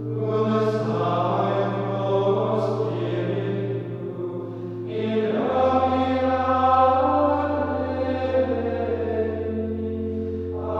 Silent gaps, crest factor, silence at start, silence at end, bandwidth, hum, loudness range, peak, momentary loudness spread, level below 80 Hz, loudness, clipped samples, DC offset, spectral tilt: none; 18 dB; 0 s; 0 s; 7.6 kHz; none; 5 LU; -6 dBFS; 9 LU; -50 dBFS; -23 LUFS; under 0.1%; under 0.1%; -8.5 dB/octave